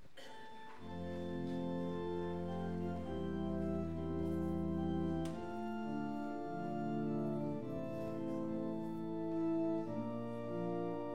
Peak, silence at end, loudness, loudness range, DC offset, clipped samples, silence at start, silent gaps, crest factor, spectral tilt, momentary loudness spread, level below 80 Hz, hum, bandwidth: -26 dBFS; 0 s; -41 LUFS; 1 LU; 0.3%; under 0.1%; 0 s; none; 12 dB; -8.5 dB/octave; 5 LU; -60 dBFS; none; 10.5 kHz